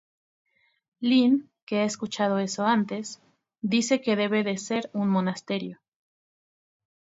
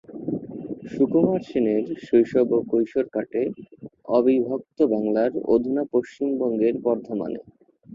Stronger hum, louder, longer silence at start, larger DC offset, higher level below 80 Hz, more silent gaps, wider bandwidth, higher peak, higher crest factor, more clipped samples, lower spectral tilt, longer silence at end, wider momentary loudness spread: neither; second, -26 LUFS vs -23 LUFS; first, 1 s vs 0.1 s; neither; second, -74 dBFS vs -62 dBFS; first, 1.62-1.67 s vs none; about the same, 8 kHz vs 7.4 kHz; second, -10 dBFS vs -6 dBFS; about the same, 18 dB vs 16 dB; neither; second, -5 dB/octave vs -9 dB/octave; first, 1.3 s vs 0 s; about the same, 10 LU vs 12 LU